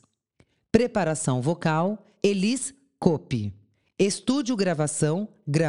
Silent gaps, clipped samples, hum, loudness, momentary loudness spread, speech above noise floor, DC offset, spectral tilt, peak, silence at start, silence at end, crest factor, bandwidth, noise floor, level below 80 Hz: none; under 0.1%; none; -25 LUFS; 7 LU; 41 dB; 0.2%; -5.5 dB/octave; -4 dBFS; 0.75 s; 0 s; 22 dB; 11.5 kHz; -65 dBFS; -58 dBFS